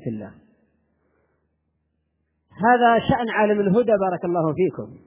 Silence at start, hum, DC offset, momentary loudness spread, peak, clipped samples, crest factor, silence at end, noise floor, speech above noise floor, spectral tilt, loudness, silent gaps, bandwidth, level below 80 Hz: 0.05 s; none; under 0.1%; 11 LU; -4 dBFS; under 0.1%; 18 dB; 0.1 s; -72 dBFS; 53 dB; -10.5 dB/octave; -20 LUFS; none; 3.8 kHz; -52 dBFS